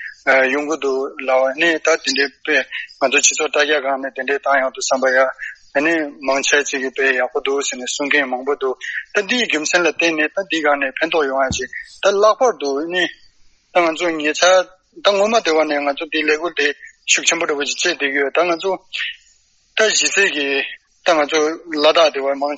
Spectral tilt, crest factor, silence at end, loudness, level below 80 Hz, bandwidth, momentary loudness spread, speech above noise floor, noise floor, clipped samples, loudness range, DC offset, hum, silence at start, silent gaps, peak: -1 dB/octave; 18 dB; 0 s; -17 LUFS; -56 dBFS; 8.4 kHz; 8 LU; 39 dB; -56 dBFS; under 0.1%; 2 LU; under 0.1%; none; 0 s; none; 0 dBFS